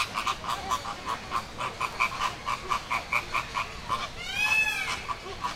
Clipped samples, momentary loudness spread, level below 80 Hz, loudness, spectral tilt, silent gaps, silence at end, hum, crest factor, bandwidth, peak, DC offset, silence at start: under 0.1%; 10 LU; -48 dBFS; -29 LUFS; -2 dB/octave; none; 0 s; none; 20 dB; 16 kHz; -10 dBFS; under 0.1%; 0 s